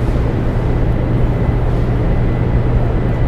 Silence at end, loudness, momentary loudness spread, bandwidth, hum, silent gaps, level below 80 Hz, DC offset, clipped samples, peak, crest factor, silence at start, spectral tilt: 0 s; -16 LUFS; 2 LU; 5.6 kHz; none; none; -18 dBFS; under 0.1%; under 0.1%; -2 dBFS; 12 dB; 0 s; -9.5 dB/octave